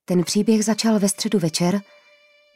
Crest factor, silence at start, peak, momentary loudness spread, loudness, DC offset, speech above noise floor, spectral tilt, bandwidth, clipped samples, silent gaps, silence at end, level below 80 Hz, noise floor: 14 dB; 0.1 s; -8 dBFS; 3 LU; -20 LUFS; under 0.1%; 35 dB; -5 dB/octave; 16 kHz; under 0.1%; none; 0.75 s; -64 dBFS; -55 dBFS